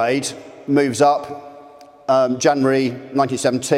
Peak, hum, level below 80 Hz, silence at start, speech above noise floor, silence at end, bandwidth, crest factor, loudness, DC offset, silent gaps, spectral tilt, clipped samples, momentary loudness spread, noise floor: -2 dBFS; none; -66 dBFS; 0 s; 26 dB; 0 s; 15 kHz; 16 dB; -18 LUFS; under 0.1%; none; -4.5 dB/octave; under 0.1%; 15 LU; -43 dBFS